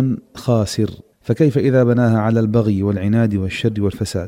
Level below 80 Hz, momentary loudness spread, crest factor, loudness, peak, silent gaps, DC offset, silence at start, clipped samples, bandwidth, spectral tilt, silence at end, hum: -46 dBFS; 8 LU; 14 dB; -17 LUFS; -4 dBFS; none; under 0.1%; 0 s; under 0.1%; 15 kHz; -7.5 dB/octave; 0 s; none